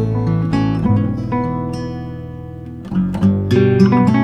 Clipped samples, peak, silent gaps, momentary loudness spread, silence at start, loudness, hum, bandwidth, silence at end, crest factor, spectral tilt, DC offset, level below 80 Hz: under 0.1%; 0 dBFS; none; 18 LU; 0 s; -16 LUFS; none; 9 kHz; 0 s; 16 dB; -9 dB/octave; under 0.1%; -36 dBFS